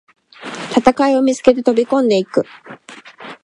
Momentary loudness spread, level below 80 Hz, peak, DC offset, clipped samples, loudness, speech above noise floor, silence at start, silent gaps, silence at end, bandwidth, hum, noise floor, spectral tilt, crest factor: 22 LU; -52 dBFS; 0 dBFS; under 0.1%; under 0.1%; -15 LUFS; 22 dB; 0.4 s; none; 0.1 s; 11 kHz; none; -36 dBFS; -5 dB/octave; 16 dB